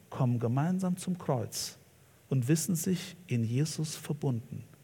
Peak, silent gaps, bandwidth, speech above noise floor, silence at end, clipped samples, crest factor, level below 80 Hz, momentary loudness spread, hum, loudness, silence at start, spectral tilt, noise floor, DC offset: -16 dBFS; none; 18 kHz; 29 dB; 0.15 s; under 0.1%; 16 dB; -72 dBFS; 7 LU; none; -32 LUFS; 0.1 s; -6 dB/octave; -60 dBFS; under 0.1%